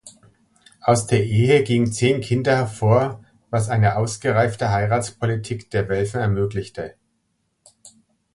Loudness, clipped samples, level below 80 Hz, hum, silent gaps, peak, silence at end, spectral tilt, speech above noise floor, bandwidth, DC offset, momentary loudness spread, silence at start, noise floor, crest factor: -20 LUFS; under 0.1%; -46 dBFS; none; none; -4 dBFS; 0.45 s; -6 dB/octave; 51 dB; 11.5 kHz; under 0.1%; 10 LU; 0.05 s; -70 dBFS; 18 dB